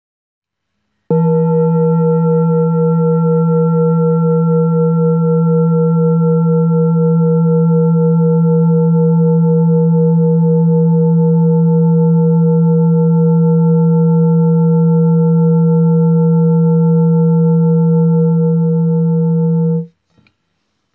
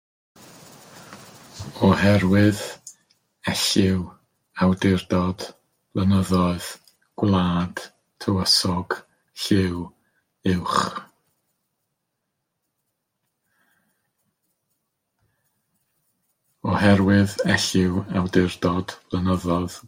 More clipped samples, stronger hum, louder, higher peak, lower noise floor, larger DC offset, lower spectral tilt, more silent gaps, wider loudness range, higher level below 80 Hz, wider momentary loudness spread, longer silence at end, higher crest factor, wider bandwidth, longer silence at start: neither; neither; first, -12 LUFS vs -22 LUFS; about the same, -4 dBFS vs -4 dBFS; second, -71 dBFS vs -78 dBFS; neither; first, -16.5 dB/octave vs -5.5 dB/octave; neither; second, 2 LU vs 8 LU; second, -74 dBFS vs -56 dBFS; second, 2 LU vs 20 LU; first, 1.1 s vs 0.1 s; second, 8 dB vs 20 dB; second, 1.4 kHz vs 16.5 kHz; first, 1.1 s vs 0.95 s